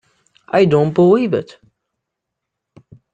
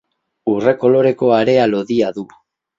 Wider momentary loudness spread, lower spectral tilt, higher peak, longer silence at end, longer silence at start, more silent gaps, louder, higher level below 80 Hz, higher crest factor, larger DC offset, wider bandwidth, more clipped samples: second, 8 LU vs 12 LU; first, -8.5 dB/octave vs -7 dB/octave; about the same, -2 dBFS vs 0 dBFS; first, 1.7 s vs 0.55 s; about the same, 0.55 s vs 0.45 s; neither; about the same, -14 LUFS vs -15 LUFS; about the same, -56 dBFS vs -58 dBFS; about the same, 16 dB vs 16 dB; neither; first, 8.6 kHz vs 7.6 kHz; neither